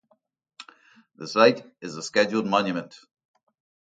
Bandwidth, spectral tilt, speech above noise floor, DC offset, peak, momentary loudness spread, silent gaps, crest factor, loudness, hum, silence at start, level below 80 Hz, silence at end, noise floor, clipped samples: 9.2 kHz; -4.5 dB/octave; 31 dB; under 0.1%; -2 dBFS; 19 LU; none; 24 dB; -23 LUFS; none; 0.6 s; -72 dBFS; 0.95 s; -55 dBFS; under 0.1%